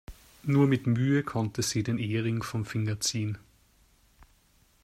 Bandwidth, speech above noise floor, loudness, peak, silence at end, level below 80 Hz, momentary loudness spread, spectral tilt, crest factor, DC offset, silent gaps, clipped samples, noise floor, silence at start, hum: 14.5 kHz; 37 dB; -29 LUFS; -12 dBFS; 1.45 s; -58 dBFS; 9 LU; -5.5 dB/octave; 18 dB; under 0.1%; none; under 0.1%; -64 dBFS; 0.1 s; none